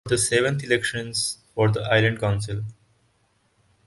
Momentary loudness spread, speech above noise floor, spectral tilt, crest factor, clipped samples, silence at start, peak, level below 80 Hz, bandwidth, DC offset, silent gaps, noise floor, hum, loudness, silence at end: 9 LU; 43 dB; -4 dB/octave; 20 dB; under 0.1%; 0.05 s; -4 dBFS; -50 dBFS; 11.5 kHz; under 0.1%; none; -66 dBFS; none; -23 LUFS; 1.15 s